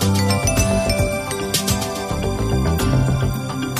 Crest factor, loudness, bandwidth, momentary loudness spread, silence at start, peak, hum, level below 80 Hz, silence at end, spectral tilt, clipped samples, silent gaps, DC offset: 14 dB; -19 LUFS; 15.5 kHz; 6 LU; 0 s; -4 dBFS; none; -28 dBFS; 0 s; -5 dB/octave; under 0.1%; none; under 0.1%